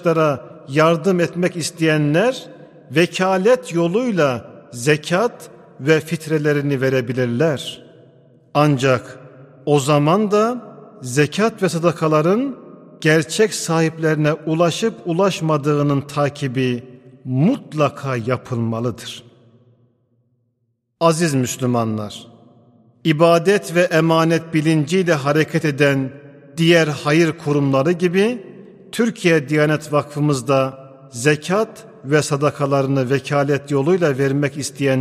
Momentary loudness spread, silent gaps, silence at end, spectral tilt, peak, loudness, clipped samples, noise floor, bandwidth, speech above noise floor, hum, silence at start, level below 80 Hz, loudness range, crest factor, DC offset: 9 LU; none; 0 s; -5.5 dB/octave; 0 dBFS; -18 LUFS; under 0.1%; -69 dBFS; 15 kHz; 52 dB; none; 0 s; -62 dBFS; 5 LU; 18 dB; under 0.1%